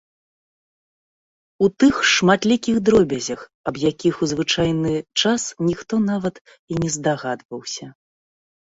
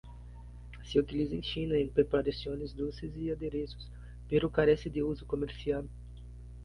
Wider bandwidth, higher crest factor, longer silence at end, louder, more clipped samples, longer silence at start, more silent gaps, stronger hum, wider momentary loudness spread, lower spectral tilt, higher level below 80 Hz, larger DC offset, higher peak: second, 8 kHz vs 10.5 kHz; about the same, 18 dB vs 20 dB; first, 0.75 s vs 0 s; first, -20 LUFS vs -33 LUFS; neither; first, 1.6 s vs 0.05 s; first, 3.54-3.64 s, 6.41-6.45 s, 6.59-6.68 s, 7.45-7.49 s vs none; second, none vs 60 Hz at -45 dBFS; second, 13 LU vs 21 LU; second, -4.5 dB/octave vs -7.5 dB/octave; second, -52 dBFS vs -46 dBFS; neither; first, -2 dBFS vs -12 dBFS